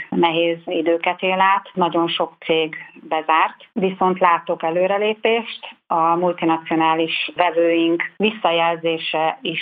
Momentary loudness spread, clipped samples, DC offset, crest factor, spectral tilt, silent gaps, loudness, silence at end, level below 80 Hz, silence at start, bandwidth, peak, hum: 6 LU; under 0.1%; under 0.1%; 18 dB; -9 dB/octave; none; -19 LUFS; 0 s; -70 dBFS; 0 s; 4.8 kHz; 0 dBFS; none